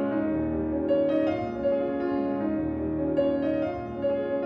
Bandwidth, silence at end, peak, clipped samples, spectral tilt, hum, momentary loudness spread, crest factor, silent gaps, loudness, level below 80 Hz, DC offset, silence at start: 5.4 kHz; 0 s; -14 dBFS; under 0.1%; -9.5 dB/octave; none; 4 LU; 12 dB; none; -27 LUFS; -48 dBFS; under 0.1%; 0 s